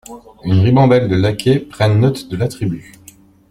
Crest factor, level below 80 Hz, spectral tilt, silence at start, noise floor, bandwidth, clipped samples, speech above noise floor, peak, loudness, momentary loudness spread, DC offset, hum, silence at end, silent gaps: 14 dB; -44 dBFS; -7.5 dB/octave; 0.1 s; -44 dBFS; 13.5 kHz; under 0.1%; 30 dB; -2 dBFS; -15 LUFS; 12 LU; under 0.1%; none; 0.7 s; none